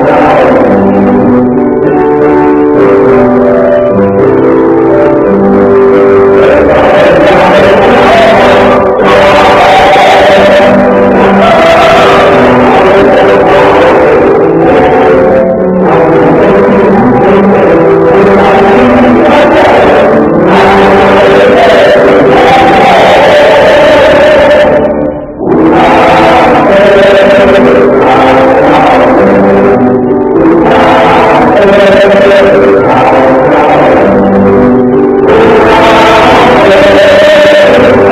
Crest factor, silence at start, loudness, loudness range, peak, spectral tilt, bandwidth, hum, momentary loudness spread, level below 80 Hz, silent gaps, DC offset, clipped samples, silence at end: 2 dB; 0 s; -3 LUFS; 2 LU; 0 dBFS; -6.5 dB/octave; 15 kHz; none; 3 LU; -28 dBFS; none; 0.2%; 20%; 0 s